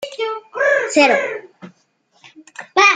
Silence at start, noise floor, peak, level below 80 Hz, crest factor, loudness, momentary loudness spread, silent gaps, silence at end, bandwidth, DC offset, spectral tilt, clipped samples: 0 s; -60 dBFS; 0 dBFS; -68 dBFS; 18 dB; -16 LUFS; 20 LU; none; 0 s; 9.6 kHz; under 0.1%; -2 dB/octave; under 0.1%